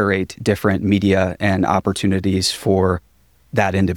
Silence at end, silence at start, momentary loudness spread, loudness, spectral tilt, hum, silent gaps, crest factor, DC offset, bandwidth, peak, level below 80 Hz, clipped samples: 0 s; 0 s; 4 LU; -18 LUFS; -5.5 dB/octave; none; none; 16 dB; 0.1%; 17 kHz; -2 dBFS; -44 dBFS; under 0.1%